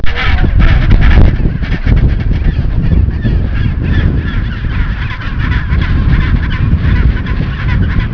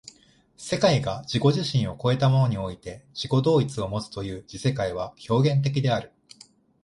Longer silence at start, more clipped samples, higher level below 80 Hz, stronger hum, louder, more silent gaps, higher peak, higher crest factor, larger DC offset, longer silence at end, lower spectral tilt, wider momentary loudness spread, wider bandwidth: second, 0 s vs 0.6 s; first, 0.8% vs under 0.1%; first, -12 dBFS vs -52 dBFS; neither; first, -13 LUFS vs -25 LUFS; neither; first, 0 dBFS vs -6 dBFS; second, 10 dB vs 18 dB; neither; second, 0 s vs 0.75 s; first, -8.5 dB/octave vs -6.5 dB/octave; second, 7 LU vs 13 LU; second, 5.4 kHz vs 11.5 kHz